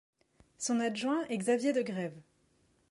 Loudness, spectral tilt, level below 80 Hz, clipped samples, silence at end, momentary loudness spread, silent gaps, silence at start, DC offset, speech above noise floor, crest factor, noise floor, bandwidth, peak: -33 LUFS; -4.5 dB/octave; -76 dBFS; under 0.1%; 0.7 s; 9 LU; none; 0.6 s; under 0.1%; 39 dB; 16 dB; -71 dBFS; 11.5 kHz; -20 dBFS